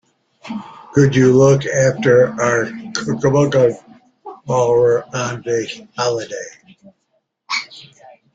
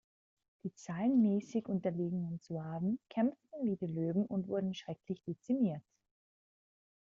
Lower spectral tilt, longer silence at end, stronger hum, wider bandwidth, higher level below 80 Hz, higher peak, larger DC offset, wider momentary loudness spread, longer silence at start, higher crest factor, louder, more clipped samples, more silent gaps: second, -5.5 dB/octave vs -8.5 dB/octave; second, 0.55 s vs 1.3 s; neither; about the same, 7.8 kHz vs 7.6 kHz; first, -52 dBFS vs -76 dBFS; first, -2 dBFS vs -22 dBFS; neither; first, 18 LU vs 11 LU; second, 0.45 s vs 0.65 s; about the same, 16 dB vs 16 dB; first, -16 LUFS vs -36 LUFS; neither; neither